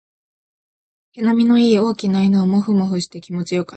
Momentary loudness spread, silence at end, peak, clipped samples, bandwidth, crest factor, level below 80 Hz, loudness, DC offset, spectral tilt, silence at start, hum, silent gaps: 10 LU; 0 s; -4 dBFS; under 0.1%; 8.8 kHz; 14 dB; -60 dBFS; -17 LUFS; under 0.1%; -7 dB/octave; 1.15 s; none; none